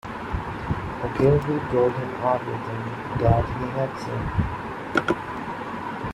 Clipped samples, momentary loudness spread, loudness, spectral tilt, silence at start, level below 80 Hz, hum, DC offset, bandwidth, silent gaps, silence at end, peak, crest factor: under 0.1%; 10 LU; -25 LUFS; -8 dB/octave; 0.05 s; -40 dBFS; none; under 0.1%; 12.5 kHz; none; 0 s; -4 dBFS; 20 dB